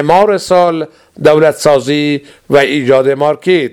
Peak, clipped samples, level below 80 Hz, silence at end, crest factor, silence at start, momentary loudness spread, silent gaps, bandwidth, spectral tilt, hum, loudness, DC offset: 0 dBFS; 0.5%; -48 dBFS; 0.05 s; 10 dB; 0 s; 7 LU; none; 15.5 kHz; -5.5 dB/octave; none; -11 LUFS; under 0.1%